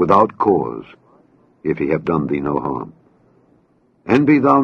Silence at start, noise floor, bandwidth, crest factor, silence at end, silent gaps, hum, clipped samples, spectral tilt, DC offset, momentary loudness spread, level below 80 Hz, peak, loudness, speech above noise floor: 0 s; -57 dBFS; 6.6 kHz; 18 dB; 0 s; none; none; under 0.1%; -9 dB/octave; under 0.1%; 16 LU; -52 dBFS; 0 dBFS; -18 LUFS; 41 dB